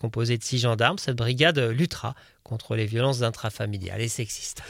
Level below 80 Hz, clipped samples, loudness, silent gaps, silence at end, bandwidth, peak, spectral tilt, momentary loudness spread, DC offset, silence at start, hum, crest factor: -54 dBFS; under 0.1%; -25 LUFS; none; 0 s; 16 kHz; -4 dBFS; -4.5 dB/octave; 12 LU; under 0.1%; 0 s; none; 22 dB